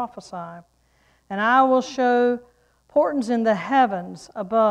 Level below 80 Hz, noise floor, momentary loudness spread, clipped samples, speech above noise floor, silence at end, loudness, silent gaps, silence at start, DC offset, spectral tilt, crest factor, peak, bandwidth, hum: -64 dBFS; -61 dBFS; 18 LU; under 0.1%; 41 dB; 0 s; -21 LUFS; none; 0 s; under 0.1%; -5.5 dB/octave; 18 dB; -4 dBFS; 10.5 kHz; none